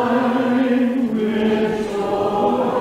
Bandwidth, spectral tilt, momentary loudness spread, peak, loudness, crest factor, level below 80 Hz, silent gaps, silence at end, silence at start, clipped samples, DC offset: 12 kHz; -6.5 dB/octave; 3 LU; -6 dBFS; -19 LUFS; 12 dB; -50 dBFS; none; 0 s; 0 s; under 0.1%; under 0.1%